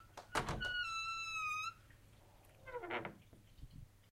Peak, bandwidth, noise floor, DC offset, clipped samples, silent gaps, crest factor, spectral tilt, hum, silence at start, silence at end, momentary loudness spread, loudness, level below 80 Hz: -22 dBFS; 16 kHz; -64 dBFS; under 0.1%; under 0.1%; none; 22 dB; -3 dB/octave; none; 0 s; 0.05 s; 21 LU; -42 LUFS; -60 dBFS